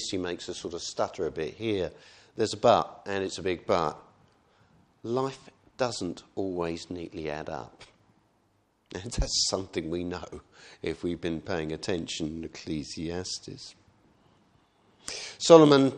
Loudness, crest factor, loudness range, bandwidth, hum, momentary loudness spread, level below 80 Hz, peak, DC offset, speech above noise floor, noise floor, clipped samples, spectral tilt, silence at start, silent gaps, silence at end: -28 LUFS; 28 dB; 7 LU; 10.5 kHz; none; 17 LU; -48 dBFS; -2 dBFS; under 0.1%; 41 dB; -69 dBFS; under 0.1%; -4.5 dB/octave; 0 s; none; 0 s